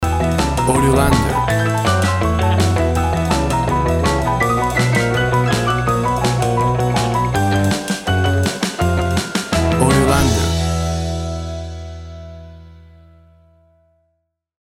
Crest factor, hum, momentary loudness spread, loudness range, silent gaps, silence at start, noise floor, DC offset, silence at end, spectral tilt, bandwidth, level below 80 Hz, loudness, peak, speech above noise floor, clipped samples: 16 dB; none; 9 LU; 9 LU; none; 0 s; -70 dBFS; under 0.1%; 1.9 s; -5.5 dB/octave; 16.5 kHz; -28 dBFS; -17 LUFS; 0 dBFS; 56 dB; under 0.1%